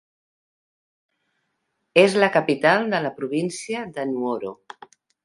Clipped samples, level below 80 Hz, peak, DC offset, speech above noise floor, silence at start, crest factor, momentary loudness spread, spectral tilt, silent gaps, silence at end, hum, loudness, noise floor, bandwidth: under 0.1%; -72 dBFS; -2 dBFS; under 0.1%; 54 dB; 1.95 s; 22 dB; 12 LU; -5 dB/octave; none; 0.7 s; none; -21 LUFS; -75 dBFS; 11.5 kHz